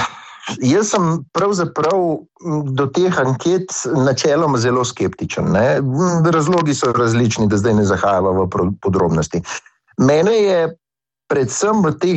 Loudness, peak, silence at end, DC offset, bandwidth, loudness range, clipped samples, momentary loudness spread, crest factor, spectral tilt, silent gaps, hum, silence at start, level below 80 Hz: -16 LUFS; -4 dBFS; 0 s; under 0.1%; 8.6 kHz; 2 LU; under 0.1%; 8 LU; 12 dB; -5.5 dB/octave; none; none; 0 s; -46 dBFS